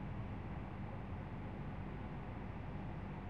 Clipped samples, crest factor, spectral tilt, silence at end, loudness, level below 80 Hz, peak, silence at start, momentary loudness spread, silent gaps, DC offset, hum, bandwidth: under 0.1%; 12 dB; -9 dB/octave; 0 s; -47 LUFS; -52 dBFS; -34 dBFS; 0 s; 1 LU; none; 0.1%; none; 6.6 kHz